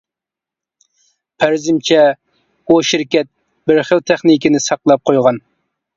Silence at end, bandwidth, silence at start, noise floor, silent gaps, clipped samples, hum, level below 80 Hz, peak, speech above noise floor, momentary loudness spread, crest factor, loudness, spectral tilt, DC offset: 0.6 s; 7.8 kHz; 1.4 s; -86 dBFS; none; under 0.1%; none; -58 dBFS; 0 dBFS; 74 dB; 11 LU; 14 dB; -13 LUFS; -4.5 dB/octave; under 0.1%